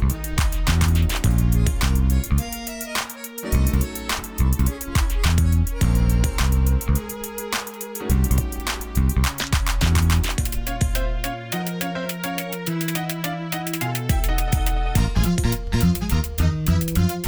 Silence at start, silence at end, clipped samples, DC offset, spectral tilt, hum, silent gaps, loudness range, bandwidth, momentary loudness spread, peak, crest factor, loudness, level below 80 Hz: 0 s; 0 s; under 0.1%; under 0.1%; -5 dB/octave; none; none; 3 LU; over 20 kHz; 7 LU; -6 dBFS; 14 dB; -22 LUFS; -24 dBFS